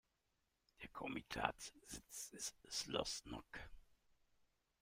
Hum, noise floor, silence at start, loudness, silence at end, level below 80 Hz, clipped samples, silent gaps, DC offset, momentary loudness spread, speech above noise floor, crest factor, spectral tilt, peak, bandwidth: none; -86 dBFS; 0.8 s; -47 LUFS; 0.9 s; -68 dBFS; under 0.1%; none; under 0.1%; 13 LU; 38 dB; 30 dB; -2 dB/octave; -20 dBFS; 16 kHz